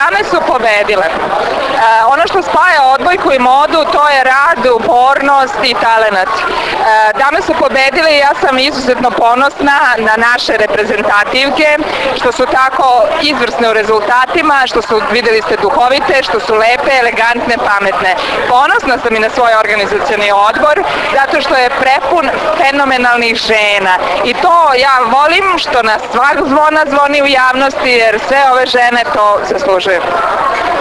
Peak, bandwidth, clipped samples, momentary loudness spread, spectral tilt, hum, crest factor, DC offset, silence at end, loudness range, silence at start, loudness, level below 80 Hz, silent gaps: 0 dBFS; 11 kHz; 0.4%; 4 LU; -3 dB/octave; none; 10 dB; under 0.1%; 0 s; 1 LU; 0 s; -9 LUFS; -40 dBFS; none